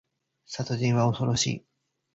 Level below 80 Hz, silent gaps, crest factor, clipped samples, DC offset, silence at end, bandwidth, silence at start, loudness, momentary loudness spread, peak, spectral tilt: -58 dBFS; none; 18 dB; under 0.1%; under 0.1%; 0.55 s; 8 kHz; 0.5 s; -26 LUFS; 13 LU; -12 dBFS; -5 dB/octave